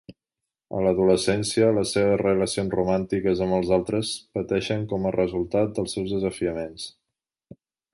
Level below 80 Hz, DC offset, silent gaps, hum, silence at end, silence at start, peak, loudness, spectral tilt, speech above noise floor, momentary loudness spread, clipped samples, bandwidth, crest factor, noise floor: -50 dBFS; under 0.1%; none; none; 1.05 s; 0.1 s; -6 dBFS; -24 LUFS; -5.5 dB/octave; 63 dB; 8 LU; under 0.1%; 11.5 kHz; 18 dB; -87 dBFS